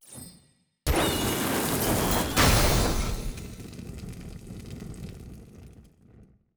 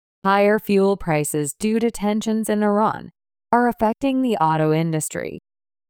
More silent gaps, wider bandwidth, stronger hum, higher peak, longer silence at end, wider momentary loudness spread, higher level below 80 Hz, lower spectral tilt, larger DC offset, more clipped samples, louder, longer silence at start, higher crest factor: neither; about the same, over 20 kHz vs 19.5 kHz; neither; second, -10 dBFS vs -4 dBFS; second, 0.35 s vs 0.5 s; first, 22 LU vs 7 LU; first, -36 dBFS vs -50 dBFS; second, -4 dB/octave vs -5.5 dB/octave; neither; neither; second, -25 LUFS vs -20 LUFS; second, 0.1 s vs 0.25 s; about the same, 18 dB vs 16 dB